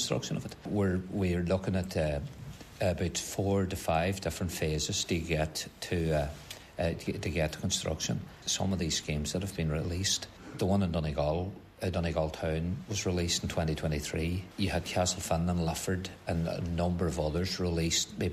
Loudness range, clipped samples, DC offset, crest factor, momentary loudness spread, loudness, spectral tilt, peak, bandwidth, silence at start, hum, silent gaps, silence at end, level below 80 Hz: 1 LU; under 0.1%; under 0.1%; 16 dB; 6 LU; -32 LUFS; -4.5 dB/octave; -14 dBFS; 14 kHz; 0 s; none; none; 0 s; -46 dBFS